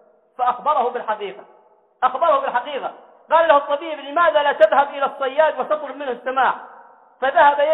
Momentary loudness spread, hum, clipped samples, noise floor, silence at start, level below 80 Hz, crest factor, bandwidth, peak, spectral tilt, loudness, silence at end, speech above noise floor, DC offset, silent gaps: 12 LU; none; under 0.1%; -46 dBFS; 0.4 s; -66 dBFS; 18 dB; 4.1 kHz; -2 dBFS; -5 dB/octave; -19 LUFS; 0 s; 28 dB; under 0.1%; none